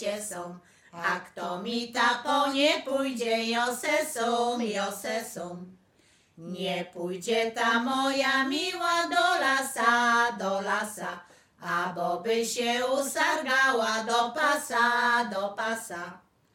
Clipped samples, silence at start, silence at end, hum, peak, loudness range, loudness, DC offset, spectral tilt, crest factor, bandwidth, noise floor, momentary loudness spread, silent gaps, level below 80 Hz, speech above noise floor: under 0.1%; 0 s; 0.35 s; none; -8 dBFS; 6 LU; -27 LUFS; under 0.1%; -2.5 dB/octave; 20 dB; 17 kHz; -64 dBFS; 13 LU; none; -76 dBFS; 36 dB